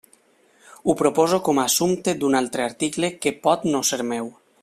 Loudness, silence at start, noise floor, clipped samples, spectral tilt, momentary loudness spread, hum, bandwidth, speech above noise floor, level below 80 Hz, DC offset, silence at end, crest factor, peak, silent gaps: -21 LUFS; 0.85 s; -58 dBFS; under 0.1%; -3.5 dB/octave; 7 LU; none; 15.5 kHz; 37 dB; -60 dBFS; under 0.1%; 0.3 s; 18 dB; -4 dBFS; none